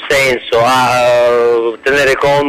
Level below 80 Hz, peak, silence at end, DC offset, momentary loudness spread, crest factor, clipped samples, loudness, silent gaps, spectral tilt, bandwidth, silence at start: -40 dBFS; -2 dBFS; 0 s; under 0.1%; 3 LU; 10 dB; under 0.1%; -11 LUFS; none; -3.5 dB/octave; 15.5 kHz; 0 s